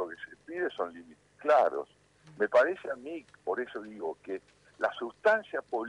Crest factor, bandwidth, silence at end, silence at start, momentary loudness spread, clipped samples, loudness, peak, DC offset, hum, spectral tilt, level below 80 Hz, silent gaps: 20 dB; 10.5 kHz; 0 s; 0 s; 16 LU; under 0.1%; -31 LUFS; -12 dBFS; under 0.1%; 50 Hz at -70 dBFS; -5 dB/octave; -76 dBFS; none